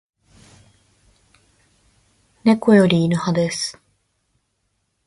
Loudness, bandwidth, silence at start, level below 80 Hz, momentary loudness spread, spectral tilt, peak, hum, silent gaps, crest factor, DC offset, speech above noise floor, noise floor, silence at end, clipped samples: -17 LUFS; 11.5 kHz; 2.45 s; -58 dBFS; 10 LU; -6 dB/octave; -2 dBFS; none; none; 20 dB; under 0.1%; 55 dB; -71 dBFS; 1.35 s; under 0.1%